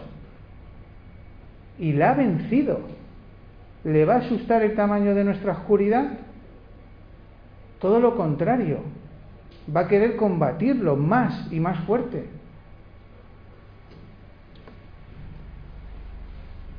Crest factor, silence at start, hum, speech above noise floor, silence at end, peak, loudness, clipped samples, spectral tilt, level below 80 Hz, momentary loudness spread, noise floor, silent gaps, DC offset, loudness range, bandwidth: 18 dB; 0 s; none; 25 dB; 0 s; -6 dBFS; -22 LUFS; under 0.1%; -11 dB/octave; -46 dBFS; 24 LU; -46 dBFS; none; under 0.1%; 5 LU; 5.2 kHz